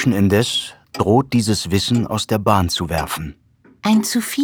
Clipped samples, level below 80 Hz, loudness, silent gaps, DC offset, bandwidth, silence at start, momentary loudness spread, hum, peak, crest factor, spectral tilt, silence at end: under 0.1%; -42 dBFS; -18 LUFS; none; under 0.1%; over 20 kHz; 0 s; 9 LU; none; 0 dBFS; 18 dB; -5 dB/octave; 0 s